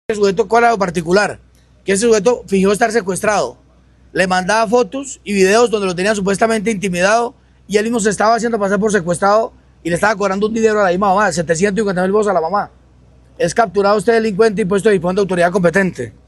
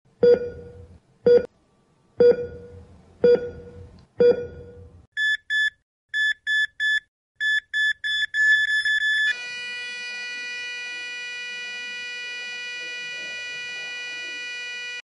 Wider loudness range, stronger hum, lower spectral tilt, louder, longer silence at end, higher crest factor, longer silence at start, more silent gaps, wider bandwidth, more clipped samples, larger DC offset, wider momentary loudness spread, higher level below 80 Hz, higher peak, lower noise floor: second, 1 LU vs 9 LU; neither; first, -4.5 dB/octave vs -3 dB/octave; first, -15 LUFS vs -23 LUFS; about the same, 0.15 s vs 0.05 s; about the same, 14 dB vs 18 dB; about the same, 0.1 s vs 0.2 s; second, none vs 5.07-5.12 s, 5.82-6.09 s, 7.08-7.35 s; first, 12.5 kHz vs 11 kHz; neither; neither; second, 7 LU vs 12 LU; first, -46 dBFS vs -58 dBFS; first, 0 dBFS vs -6 dBFS; second, -48 dBFS vs -62 dBFS